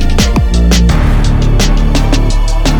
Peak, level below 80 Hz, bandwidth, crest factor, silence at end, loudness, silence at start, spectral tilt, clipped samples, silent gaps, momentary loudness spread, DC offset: 0 dBFS; -10 dBFS; 16 kHz; 8 dB; 0 s; -11 LUFS; 0 s; -5 dB/octave; under 0.1%; none; 3 LU; under 0.1%